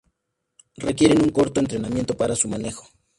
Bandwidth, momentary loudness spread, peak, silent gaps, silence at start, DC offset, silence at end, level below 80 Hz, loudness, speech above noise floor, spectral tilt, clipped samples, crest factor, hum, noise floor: 11.5 kHz; 13 LU; -4 dBFS; none; 0.8 s; under 0.1%; 0.35 s; -48 dBFS; -21 LUFS; 56 dB; -5 dB/octave; under 0.1%; 20 dB; none; -77 dBFS